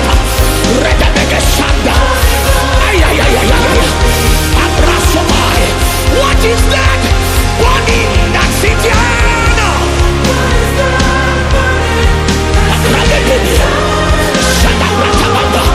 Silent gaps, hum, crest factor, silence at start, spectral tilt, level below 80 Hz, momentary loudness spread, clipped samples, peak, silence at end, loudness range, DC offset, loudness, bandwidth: none; none; 8 dB; 0 s; -4 dB/octave; -14 dBFS; 2 LU; 0.2%; 0 dBFS; 0 s; 1 LU; under 0.1%; -10 LUFS; 16 kHz